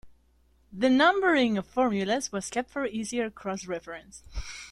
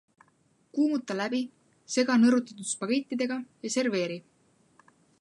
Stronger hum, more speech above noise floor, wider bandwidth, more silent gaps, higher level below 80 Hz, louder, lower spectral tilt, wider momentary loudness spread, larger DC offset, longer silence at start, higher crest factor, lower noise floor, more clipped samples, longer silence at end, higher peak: neither; second, 36 dB vs 40 dB; about the same, 12 kHz vs 11.5 kHz; neither; first, -50 dBFS vs -82 dBFS; about the same, -27 LUFS vs -28 LUFS; about the same, -4 dB/octave vs -4 dB/octave; first, 20 LU vs 13 LU; neither; second, 0.05 s vs 0.75 s; about the same, 18 dB vs 20 dB; about the same, -64 dBFS vs -67 dBFS; neither; second, 0 s vs 1 s; about the same, -10 dBFS vs -10 dBFS